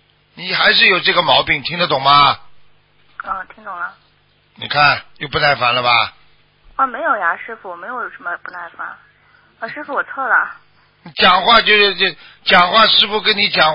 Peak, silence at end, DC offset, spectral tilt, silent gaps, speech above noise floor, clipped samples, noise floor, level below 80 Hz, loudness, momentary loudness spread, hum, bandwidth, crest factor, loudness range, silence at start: 0 dBFS; 0 s; under 0.1%; -5.5 dB/octave; none; 41 dB; under 0.1%; -56 dBFS; -50 dBFS; -13 LUFS; 20 LU; none; 8 kHz; 16 dB; 10 LU; 0.35 s